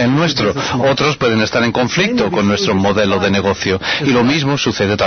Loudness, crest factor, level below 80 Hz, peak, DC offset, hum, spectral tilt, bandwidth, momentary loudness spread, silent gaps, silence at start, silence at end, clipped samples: -14 LUFS; 10 dB; -42 dBFS; -4 dBFS; under 0.1%; none; -5 dB/octave; 6.6 kHz; 3 LU; none; 0 s; 0 s; under 0.1%